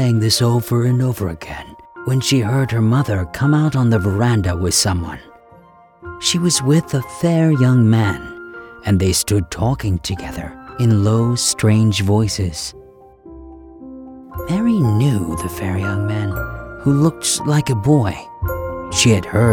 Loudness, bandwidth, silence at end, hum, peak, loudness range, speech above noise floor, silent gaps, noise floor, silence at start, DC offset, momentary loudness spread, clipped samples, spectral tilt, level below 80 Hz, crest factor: -17 LUFS; 18 kHz; 0 s; none; -2 dBFS; 4 LU; 30 dB; none; -46 dBFS; 0 s; under 0.1%; 15 LU; under 0.1%; -5 dB/octave; -38 dBFS; 16 dB